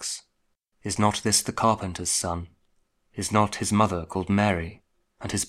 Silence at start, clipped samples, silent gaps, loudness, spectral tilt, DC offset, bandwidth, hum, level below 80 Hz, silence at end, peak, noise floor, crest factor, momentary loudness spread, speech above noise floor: 0 s; under 0.1%; none; -25 LUFS; -4 dB/octave; under 0.1%; 15.5 kHz; none; -50 dBFS; 0 s; -6 dBFS; -73 dBFS; 22 dB; 14 LU; 48 dB